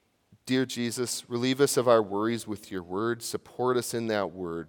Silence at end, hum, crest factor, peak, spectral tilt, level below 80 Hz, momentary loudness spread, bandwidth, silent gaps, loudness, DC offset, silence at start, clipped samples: 0 s; none; 22 dB; -6 dBFS; -4.5 dB/octave; -72 dBFS; 11 LU; 18 kHz; none; -28 LUFS; under 0.1%; 0.45 s; under 0.1%